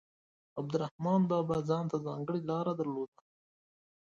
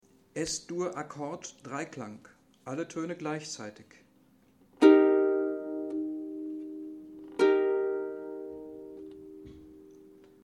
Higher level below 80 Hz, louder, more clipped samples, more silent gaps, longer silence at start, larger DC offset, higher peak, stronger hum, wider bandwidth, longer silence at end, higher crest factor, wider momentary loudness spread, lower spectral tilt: about the same, -70 dBFS vs -70 dBFS; second, -34 LUFS vs -29 LUFS; neither; first, 0.91-0.99 s vs none; first, 0.55 s vs 0.35 s; neither; second, -18 dBFS vs -6 dBFS; neither; second, 7.4 kHz vs 11 kHz; first, 1 s vs 0.35 s; second, 16 dB vs 24 dB; second, 11 LU vs 22 LU; first, -8.5 dB/octave vs -5 dB/octave